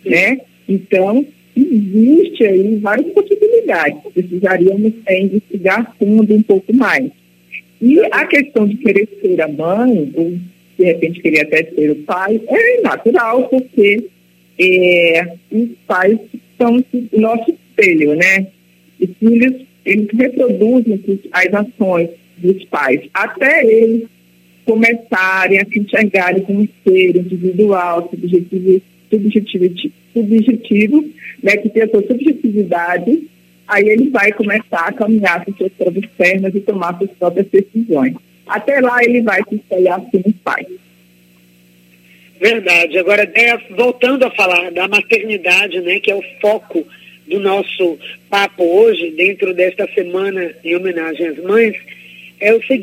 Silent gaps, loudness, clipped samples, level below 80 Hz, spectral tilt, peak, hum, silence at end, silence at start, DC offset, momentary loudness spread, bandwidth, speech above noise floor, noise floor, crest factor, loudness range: none; -13 LUFS; under 0.1%; -62 dBFS; -6 dB/octave; 0 dBFS; none; 0 s; 0.05 s; under 0.1%; 9 LU; 16 kHz; 36 dB; -49 dBFS; 14 dB; 3 LU